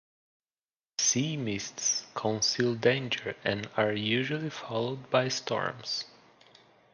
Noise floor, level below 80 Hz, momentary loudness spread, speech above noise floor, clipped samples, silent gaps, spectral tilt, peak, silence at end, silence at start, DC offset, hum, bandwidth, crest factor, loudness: under -90 dBFS; -68 dBFS; 8 LU; over 60 dB; under 0.1%; none; -3 dB/octave; -10 dBFS; 0.85 s; 1 s; under 0.1%; none; 11 kHz; 20 dB; -30 LUFS